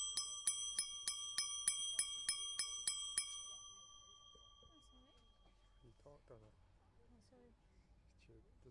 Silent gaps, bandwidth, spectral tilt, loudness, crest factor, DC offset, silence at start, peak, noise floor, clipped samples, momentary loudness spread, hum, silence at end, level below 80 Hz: none; 11.5 kHz; 2 dB/octave; -41 LUFS; 26 dB; under 0.1%; 0 s; -22 dBFS; -70 dBFS; under 0.1%; 22 LU; none; 0 s; -72 dBFS